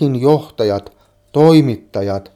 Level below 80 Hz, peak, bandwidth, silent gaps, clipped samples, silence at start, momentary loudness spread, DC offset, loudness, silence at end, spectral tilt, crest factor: -52 dBFS; 0 dBFS; 14 kHz; none; under 0.1%; 0 s; 11 LU; under 0.1%; -15 LUFS; 0.15 s; -8 dB/octave; 14 dB